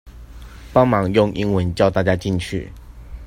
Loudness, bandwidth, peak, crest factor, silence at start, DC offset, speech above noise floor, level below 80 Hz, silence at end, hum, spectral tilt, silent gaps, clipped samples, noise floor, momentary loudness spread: -19 LUFS; 15.5 kHz; 0 dBFS; 20 dB; 0.05 s; under 0.1%; 20 dB; -38 dBFS; 0 s; none; -7 dB/octave; none; under 0.1%; -38 dBFS; 11 LU